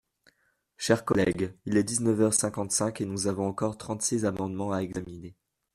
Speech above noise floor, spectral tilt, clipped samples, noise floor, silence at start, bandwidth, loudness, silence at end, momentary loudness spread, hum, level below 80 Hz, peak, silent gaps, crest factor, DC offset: 44 dB; -4.5 dB/octave; under 0.1%; -72 dBFS; 0.8 s; 15 kHz; -28 LUFS; 0.45 s; 11 LU; none; -60 dBFS; -8 dBFS; none; 20 dB; under 0.1%